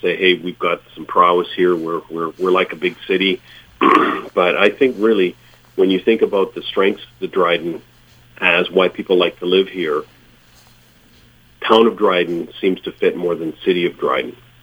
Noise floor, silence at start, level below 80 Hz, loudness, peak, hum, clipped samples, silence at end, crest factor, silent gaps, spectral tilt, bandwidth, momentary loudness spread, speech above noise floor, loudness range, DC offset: -49 dBFS; 0.05 s; -56 dBFS; -17 LUFS; 0 dBFS; none; under 0.1%; 0.3 s; 18 dB; none; -6 dB/octave; over 20 kHz; 9 LU; 33 dB; 3 LU; under 0.1%